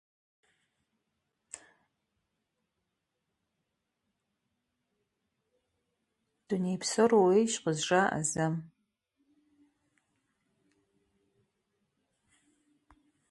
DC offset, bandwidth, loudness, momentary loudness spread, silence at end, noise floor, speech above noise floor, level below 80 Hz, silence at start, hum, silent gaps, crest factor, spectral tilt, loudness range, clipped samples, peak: under 0.1%; 11.5 kHz; -29 LUFS; 24 LU; 4.65 s; -84 dBFS; 56 dB; -74 dBFS; 6.5 s; none; none; 22 dB; -4.5 dB/octave; 12 LU; under 0.1%; -12 dBFS